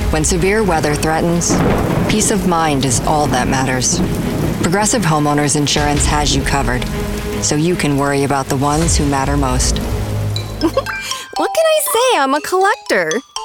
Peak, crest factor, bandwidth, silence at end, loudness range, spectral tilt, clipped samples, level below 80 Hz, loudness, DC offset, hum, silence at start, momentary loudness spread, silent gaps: -2 dBFS; 12 dB; 19 kHz; 0 s; 2 LU; -4 dB/octave; under 0.1%; -26 dBFS; -15 LUFS; under 0.1%; none; 0 s; 6 LU; none